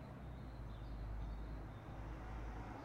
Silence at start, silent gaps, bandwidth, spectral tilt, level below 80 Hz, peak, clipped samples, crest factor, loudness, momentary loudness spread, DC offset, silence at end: 0 s; none; 7.8 kHz; -7.5 dB/octave; -50 dBFS; -36 dBFS; under 0.1%; 12 dB; -51 LUFS; 3 LU; under 0.1%; 0 s